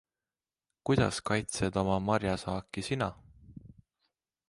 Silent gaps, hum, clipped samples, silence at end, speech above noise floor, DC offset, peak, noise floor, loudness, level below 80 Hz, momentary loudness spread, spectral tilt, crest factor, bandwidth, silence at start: none; none; under 0.1%; 0.8 s; over 59 dB; under 0.1%; -12 dBFS; under -90 dBFS; -32 LUFS; -52 dBFS; 8 LU; -5.5 dB/octave; 20 dB; 11.5 kHz; 0.85 s